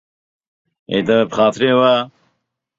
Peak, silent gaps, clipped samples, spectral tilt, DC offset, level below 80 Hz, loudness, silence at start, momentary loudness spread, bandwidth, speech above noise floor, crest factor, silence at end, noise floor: -2 dBFS; none; under 0.1%; -5.5 dB/octave; under 0.1%; -58 dBFS; -15 LUFS; 0.9 s; 8 LU; 7.8 kHz; 56 dB; 16 dB; 0.7 s; -71 dBFS